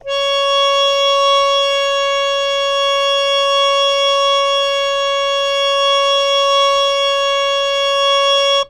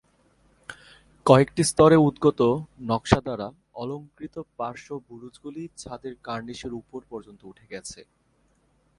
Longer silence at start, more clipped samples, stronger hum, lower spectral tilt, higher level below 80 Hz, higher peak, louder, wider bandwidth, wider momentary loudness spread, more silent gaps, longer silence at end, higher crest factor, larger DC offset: second, 0.05 s vs 0.7 s; neither; neither; second, 2 dB/octave vs -6 dB/octave; about the same, -50 dBFS vs -50 dBFS; second, -4 dBFS vs 0 dBFS; first, -13 LUFS vs -22 LUFS; first, 13 kHz vs 11.5 kHz; second, 3 LU vs 23 LU; neither; second, 0 s vs 0.95 s; second, 12 dB vs 26 dB; neither